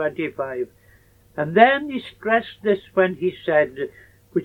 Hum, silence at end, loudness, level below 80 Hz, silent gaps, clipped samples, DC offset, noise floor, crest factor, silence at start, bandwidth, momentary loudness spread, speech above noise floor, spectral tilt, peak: none; 0 s; -21 LUFS; -60 dBFS; none; under 0.1%; under 0.1%; -54 dBFS; 20 dB; 0 s; 9 kHz; 16 LU; 33 dB; -7.5 dB/octave; -2 dBFS